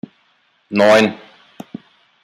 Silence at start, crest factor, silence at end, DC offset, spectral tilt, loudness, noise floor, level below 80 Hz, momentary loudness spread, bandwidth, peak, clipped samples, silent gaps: 0.7 s; 18 dB; 1.1 s; under 0.1%; -5 dB/octave; -14 LUFS; -60 dBFS; -64 dBFS; 26 LU; 15 kHz; -2 dBFS; under 0.1%; none